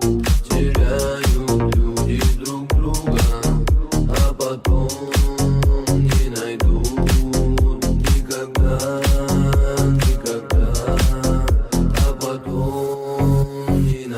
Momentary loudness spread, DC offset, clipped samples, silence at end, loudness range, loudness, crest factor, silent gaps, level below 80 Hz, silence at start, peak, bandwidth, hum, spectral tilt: 3 LU; under 0.1%; under 0.1%; 0 s; 1 LU; -19 LUFS; 12 dB; none; -20 dBFS; 0 s; -4 dBFS; 16.5 kHz; none; -6 dB/octave